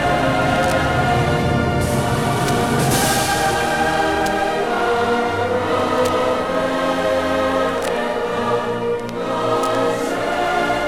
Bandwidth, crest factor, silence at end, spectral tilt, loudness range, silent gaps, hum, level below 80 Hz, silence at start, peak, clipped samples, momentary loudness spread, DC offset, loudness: 17.5 kHz; 14 dB; 0 s; -4.5 dB/octave; 2 LU; none; none; -38 dBFS; 0 s; -4 dBFS; under 0.1%; 4 LU; under 0.1%; -18 LUFS